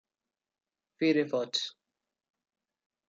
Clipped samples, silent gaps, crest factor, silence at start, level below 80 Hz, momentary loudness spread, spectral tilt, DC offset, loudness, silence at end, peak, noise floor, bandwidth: under 0.1%; none; 20 dB; 1 s; -86 dBFS; 7 LU; -4 dB/octave; under 0.1%; -30 LUFS; 1.4 s; -16 dBFS; under -90 dBFS; 7.6 kHz